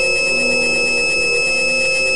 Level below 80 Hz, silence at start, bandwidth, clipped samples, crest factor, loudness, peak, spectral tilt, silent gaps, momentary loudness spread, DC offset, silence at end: -42 dBFS; 0 s; 10.5 kHz; under 0.1%; 10 dB; -14 LUFS; -8 dBFS; -1 dB/octave; none; 0 LU; 3%; 0 s